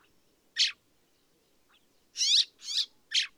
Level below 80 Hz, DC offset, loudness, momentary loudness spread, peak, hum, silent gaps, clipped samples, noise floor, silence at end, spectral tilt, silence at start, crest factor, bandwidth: -84 dBFS; under 0.1%; -27 LUFS; 11 LU; -14 dBFS; none; none; under 0.1%; -69 dBFS; 0.1 s; 5.5 dB/octave; 0.55 s; 20 dB; over 20 kHz